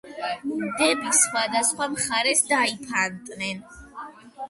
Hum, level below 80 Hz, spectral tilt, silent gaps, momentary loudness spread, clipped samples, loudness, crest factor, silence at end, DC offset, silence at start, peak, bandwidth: none; -60 dBFS; -1 dB/octave; none; 21 LU; under 0.1%; -23 LUFS; 20 dB; 0 s; under 0.1%; 0.05 s; -6 dBFS; 12 kHz